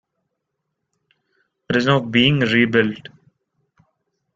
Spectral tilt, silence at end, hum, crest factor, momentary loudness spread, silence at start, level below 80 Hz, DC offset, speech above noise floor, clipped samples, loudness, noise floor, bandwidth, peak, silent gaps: -6.5 dB/octave; 1.35 s; none; 20 dB; 8 LU; 1.7 s; -54 dBFS; under 0.1%; 60 dB; under 0.1%; -17 LUFS; -77 dBFS; 7.6 kHz; -2 dBFS; none